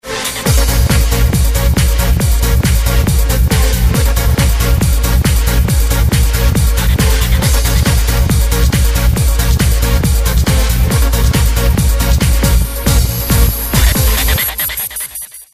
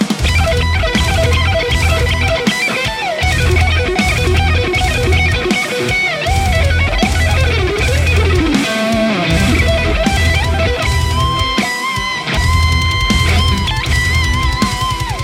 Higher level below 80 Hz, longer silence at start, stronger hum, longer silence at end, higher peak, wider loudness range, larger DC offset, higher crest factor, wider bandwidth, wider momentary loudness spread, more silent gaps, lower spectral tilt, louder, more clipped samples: first, -12 dBFS vs -20 dBFS; about the same, 0.05 s vs 0 s; neither; about the same, 0.1 s vs 0 s; about the same, 0 dBFS vs 0 dBFS; about the same, 0 LU vs 1 LU; neither; about the same, 10 dB vs 12 dB; about the same, 15.5 kHz vs 16 kHz; about the same, 1 LU vs 3 LU; neither; about the same, -4.5 dB/octave vs -4.5 dB/octave; about the same, -13 LUFS vs -13 LUFS; neither